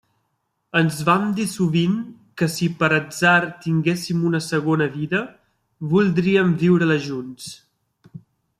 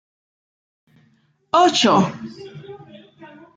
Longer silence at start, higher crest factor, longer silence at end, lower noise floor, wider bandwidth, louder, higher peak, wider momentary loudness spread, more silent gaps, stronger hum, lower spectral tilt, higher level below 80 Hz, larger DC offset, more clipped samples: second, 0.75 s vs 1.55 s; about the same, 18 dB vs 18 dB; about the same, 0.4 s vs 0.3 s; first, -73 dBFS vs -60 dBFS; first, 14.5 kHz vs 9.4 kHz; second, -20 LUFS vs -16 LUFS; about the same, -4 dBFS vs -4 dBFS; second, 13 LU vs 25 LU; neither; neither; first, -6 dB/octave vs -4.5 dB/octave; first, -60 dBFS vs -68 dBFS; neither; neither